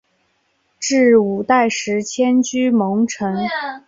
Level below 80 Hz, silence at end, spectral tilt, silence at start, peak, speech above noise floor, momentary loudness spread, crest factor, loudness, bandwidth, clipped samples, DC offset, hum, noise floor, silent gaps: -60 dBFS; 0.1 s; -4.5 dB/octave; 0.8 s; -2 dBFS; 48 dB; 8 LU; 14 dB; -17 LUFS; 7.8 kHz; under 0.1%; under 0.1%; none; -64 dBFS; none